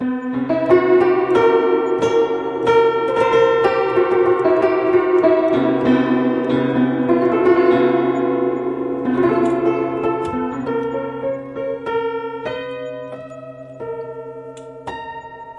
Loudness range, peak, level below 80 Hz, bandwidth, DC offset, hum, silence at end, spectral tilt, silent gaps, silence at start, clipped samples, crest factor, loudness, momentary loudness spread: 11 LU; 0 dBFS; -54 dBFS; 7.8 kHz; under 0.1%; none; 0 s; -7 dB/octave; none; 0 s; under 0.1%; 16 dB; -17 LUFS; 17 LU